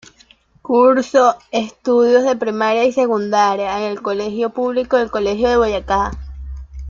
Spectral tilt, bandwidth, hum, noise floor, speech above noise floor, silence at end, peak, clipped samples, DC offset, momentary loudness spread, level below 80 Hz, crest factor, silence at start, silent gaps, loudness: -5 dB/octave; 7.4 kHz; none; -51 dBFS; 35 dB; 0 s; -2 dBFS; under 0.1%; under 0.1%; 10 LU; -38 dBFS; 14 dB; 0.65 s; none; -16 LUFS